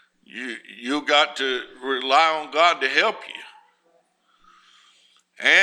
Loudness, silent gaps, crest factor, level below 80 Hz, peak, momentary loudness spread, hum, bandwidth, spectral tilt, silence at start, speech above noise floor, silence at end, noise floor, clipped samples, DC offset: -20 LUFS; none; 22 dB; -72 dBFS; -2 dBFS; 17 LU; none; 11.5 kHz; -1 dB/octave; 0.35 s; 42 dB; 0 s; -64 dBFS; under 0.1%; under 0.1%